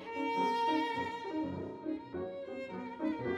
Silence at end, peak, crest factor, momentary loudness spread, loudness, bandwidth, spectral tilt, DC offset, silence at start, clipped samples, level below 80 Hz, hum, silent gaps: 0 s; -22 dBFS; 16 dB; 10 LU; -37 LUFS; 12 kHz; -6 dB/octave; under 0.1%; 0 s; under 0.1%; -70 dBFS; none; none